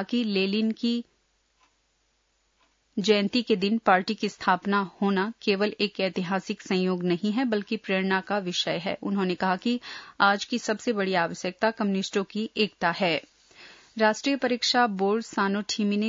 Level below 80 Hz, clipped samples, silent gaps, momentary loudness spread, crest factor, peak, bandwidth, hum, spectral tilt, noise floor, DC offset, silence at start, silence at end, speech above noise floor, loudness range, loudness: -72 dBFS; under 0.1%; none; 6 LU; 20 dB; -6 dBFS; 7.8 kHz; none; -5 dB/octave; -71 dBFS; under 0.1%; 0 s; 0 s; 45 dB; 2 LU; -26 LUFS